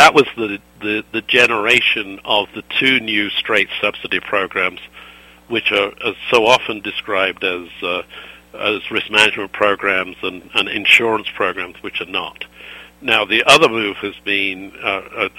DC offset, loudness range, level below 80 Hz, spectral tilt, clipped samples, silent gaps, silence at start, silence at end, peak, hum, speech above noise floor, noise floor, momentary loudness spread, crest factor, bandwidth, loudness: under 0.1%; 3 LU; -52 dBFS; -2.5 dB/octave; under 0.1%; none; 0 s; 0.1 s; 0 dBFS; none; 24 dB; -42 dBFS; 14 LU; 18 dB; 16.5 kHz; -16 LUFS